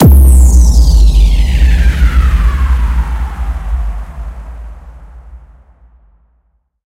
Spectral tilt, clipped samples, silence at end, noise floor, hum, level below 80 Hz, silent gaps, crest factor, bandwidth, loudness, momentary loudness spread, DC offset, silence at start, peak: -6 dB/octave; 1%; 1.5 s; -58 dBFS; none; -10 dBFS; none; 10 dB; 16 kHz; -11 LUFS; 21 LU; under 0.1%; 0 s; 0 dBFS